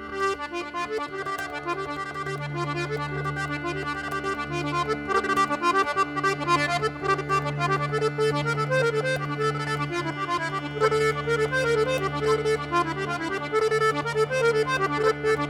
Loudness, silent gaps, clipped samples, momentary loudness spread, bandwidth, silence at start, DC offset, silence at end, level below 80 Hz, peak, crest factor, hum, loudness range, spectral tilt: -25 LUFS; none; under 0.1%; 7 LU; 15 kHz; 0 s; under 0.1%; 0 s; -52 dBFS; -8 dBFS; 18 dB; none; 5 LU; -5 dB/octave